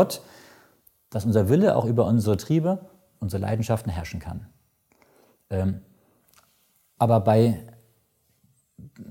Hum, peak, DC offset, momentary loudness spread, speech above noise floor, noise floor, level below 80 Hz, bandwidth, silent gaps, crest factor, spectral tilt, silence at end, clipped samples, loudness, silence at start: none; -4 dBFS; under 0.1%; 16 LU; 45 dB; -67 dBFS; -52 dBFS; 17 kHz; none; 20 dB; -7.5 dB/octave; 0 s; under 0.1%; -24 LUFS; 0 s